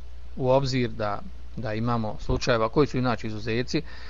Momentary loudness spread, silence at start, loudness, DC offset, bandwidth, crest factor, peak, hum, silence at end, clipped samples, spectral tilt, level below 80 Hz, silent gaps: 11 LU; 0 s; -27 LUFS; 2%; 7.6 kHz; 18 dB; -8 dBFS; none; 0 s; under 0.1%; -6.5 dB/octave; -40 dBFS; none